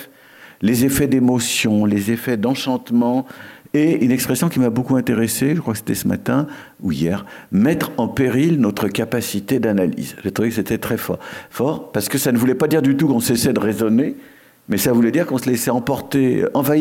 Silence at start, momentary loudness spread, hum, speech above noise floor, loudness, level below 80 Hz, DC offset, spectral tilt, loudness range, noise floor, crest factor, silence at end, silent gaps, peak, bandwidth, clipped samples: 0 s; 7 LU; none; 27 dB; -18 LUFS; -50 dBFS; under 0.1%; -5.5 dB/octave; 2 LU; -44 dBFS; 14 dB; 0 s; none; -4 dBFS; 17 kHz; under 0.1%